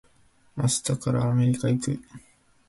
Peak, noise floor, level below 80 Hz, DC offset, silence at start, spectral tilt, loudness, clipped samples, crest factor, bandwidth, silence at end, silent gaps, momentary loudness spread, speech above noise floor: -12 dBFS; -60 dBFS; -56 dBFS; under 0.1%; 0.55 s; -5.5 dB/octave; -25 LUFS; under 0.1%; 14 dB; 12 kHz; 0.5 s; none; 10 LU; 35 dB